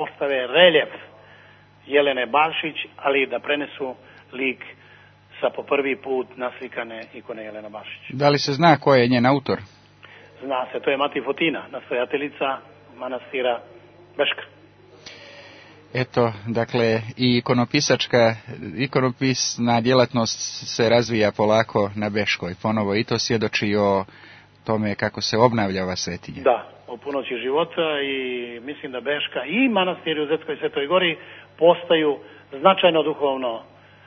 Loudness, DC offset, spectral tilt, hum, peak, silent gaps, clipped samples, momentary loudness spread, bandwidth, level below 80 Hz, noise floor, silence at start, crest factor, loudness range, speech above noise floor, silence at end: -21 LUFS; under 0.1%; -4.5 dB/octave; none; 0 dBFS; none; under 0.1%; 16 LU; 6.6 kHz; -62 dBFS; -50 dBFS; 0 s; 22 dB; 7 LU; 29 dB; 0.45 s